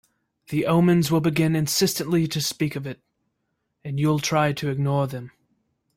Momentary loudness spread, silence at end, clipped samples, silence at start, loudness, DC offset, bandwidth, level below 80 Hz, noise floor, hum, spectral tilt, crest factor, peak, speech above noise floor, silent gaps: 14 LU; 0.7 s; under 0.1%; 0.5 s; -22 LUFS; under 0.1%; 16.5 kHz; -58 dBFS; -76 dBFS; none; -5.5 dB/octave; 16 dB; -8 dBFS; 54 dB; none